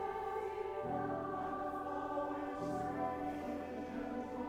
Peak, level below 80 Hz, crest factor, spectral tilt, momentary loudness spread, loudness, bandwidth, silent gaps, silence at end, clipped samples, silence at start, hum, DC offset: -28 dBFS; -64 dBFS; 12 dB; -7 dB/octave; 3 LU; -41 LUFS; 17 kHz; none; 0 s; under 0.1%; 0 s; none; under 0.1%